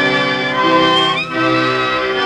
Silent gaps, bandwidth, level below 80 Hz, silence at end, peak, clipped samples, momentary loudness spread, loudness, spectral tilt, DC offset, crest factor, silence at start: none; 10.5 kHz; -50 dBFS; 0 s; -2 dBFS; under 0.1%; 4 LU; -14 LUFS; -4.5 dB/octave; under 0.1%; 12 dB; 0 s